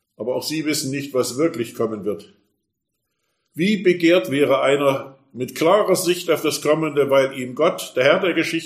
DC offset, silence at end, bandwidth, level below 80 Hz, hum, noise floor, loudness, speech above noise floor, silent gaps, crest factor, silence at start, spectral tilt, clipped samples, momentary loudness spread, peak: under 0.1%; 0 s; 15.5 kHz; -68 dBFS; none; -77 dBFS; -19 LUFS; 58 dB; none; 18 dB; 0.2 s; -4.5 dB/octave; under 0.1%; 11 LU; -2 dBFS